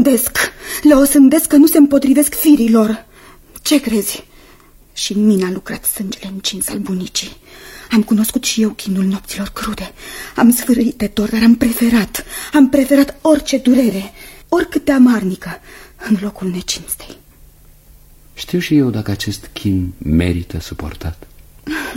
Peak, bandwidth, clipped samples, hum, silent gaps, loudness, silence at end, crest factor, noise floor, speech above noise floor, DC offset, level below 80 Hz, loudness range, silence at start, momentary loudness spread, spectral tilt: 0 dBFS; 16.5 kHz; under 0.1%; none; none; -14 LUFS; 0 s; 14 dB; -45 dBFS; 30 dB; under 0.1%; -38 dBFS; 9 LU; 0 s; 16 LU; -4.5 dB/octave